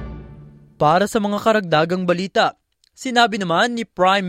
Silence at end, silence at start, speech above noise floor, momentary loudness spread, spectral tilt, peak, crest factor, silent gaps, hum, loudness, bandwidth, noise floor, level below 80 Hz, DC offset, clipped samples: 0 s; 0 s; 25 dB; 5 LU; -5 dB/octave; -2 dBFS; 16 dB; none; none; -18 LUFS; 16 kHz; -43 dBFS; -46 dBFS; under 0.1%; under 0.1%